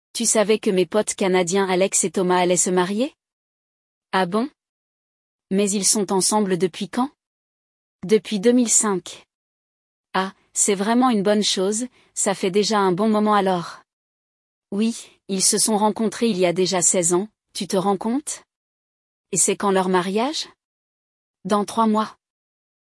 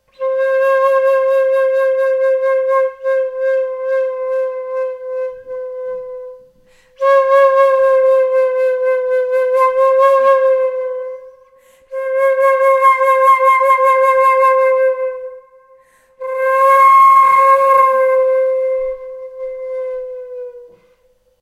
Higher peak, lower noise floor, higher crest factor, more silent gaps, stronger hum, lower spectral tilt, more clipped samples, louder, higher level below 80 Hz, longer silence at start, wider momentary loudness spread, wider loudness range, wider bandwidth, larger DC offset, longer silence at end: second, -4 dBFS vs 0 dBFS; first, under -90 dBFS vs -56 dBFS; about the same, 18 dB vs 14 dB; first, 3.33-4.02 s, 4.69-5.39 s, 7.27-7.99 s, 9.35-10.04 s, 13.93-14.62 s, 18.56-19.24 s, 20.64-21.34 s vs none; neither; first, -3.5 dB/octave vs -1 dB/octave; neither; second, -20 LUFS vs -13 LUFS; second, -70 dBFS vs -60 dBFS; about the same, 0.15 s vs 0.2 s; second, 11 LU vs 17 LU; second, 4 LU vs 8 LU; about the same, 12 kHz vs 13 kHz; neither; about the same, 0.85 s vs 0.75 s